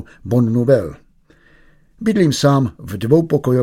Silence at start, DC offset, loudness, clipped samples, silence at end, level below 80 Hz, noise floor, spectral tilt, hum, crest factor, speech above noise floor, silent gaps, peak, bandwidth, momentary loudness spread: 0 s; under 0.1%; -16 LUFS; under 0.1%; 0 s; -46 dBFS; -51 dBFS; -7 dB/octave; none; 16 dB; 36 dB; none; 0 dBFS; 16 kHz; 9 LU